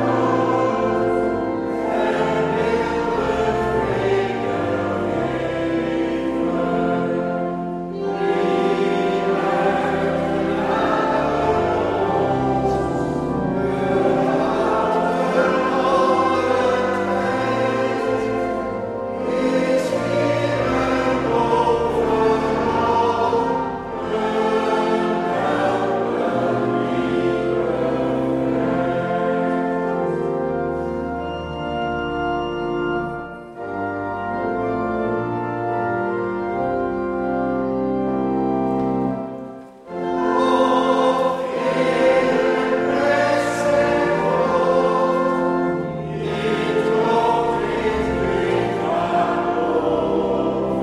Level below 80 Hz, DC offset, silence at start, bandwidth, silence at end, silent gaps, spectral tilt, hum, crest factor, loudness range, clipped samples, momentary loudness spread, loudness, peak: -44 dBFS; under 0.1%; 0 s; 12 kHz; 0 s; none; -6.5 dB/octave; none; 14 dB; 5 LU; under 0.1%; 6 LU; -20 LUFS; -6 dBFS